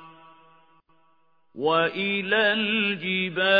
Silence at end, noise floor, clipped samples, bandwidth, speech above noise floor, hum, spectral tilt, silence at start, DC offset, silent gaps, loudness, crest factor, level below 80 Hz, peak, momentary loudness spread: 0 s; -67 dBFS; under 0.1%; 5.2 kHz; 44 dB; none; -7 dB/octave; 0 s; under 0.1%; none; -23 LUFS; 20 dB; -76 dBFS; -6 dBFS; 5 LU